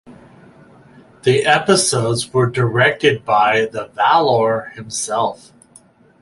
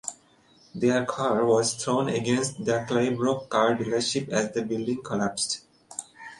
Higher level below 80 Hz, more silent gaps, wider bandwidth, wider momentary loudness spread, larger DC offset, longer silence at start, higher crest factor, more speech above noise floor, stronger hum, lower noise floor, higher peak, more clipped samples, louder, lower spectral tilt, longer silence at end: first, -54 dBFS vs -64 dBFS; neither; about the same, 11.5 kHz vs 11.5 kHz; second, 9 LU vs 12 LU; neither; about the same, 0.1 s vs 0.05 s; about the same, 16 dB vs 20 dB; about the same, 33 dB vs 33 dB; neither; second, -49 dBFS vs -59 dBFS; first, 0 dBFS vs -6 dBFS; neither; first, -16 LUFS vs -26 LUFS; about the same, -4 dB/octave vs -4 dB/octave; first, 0.85 s vs 0.05 s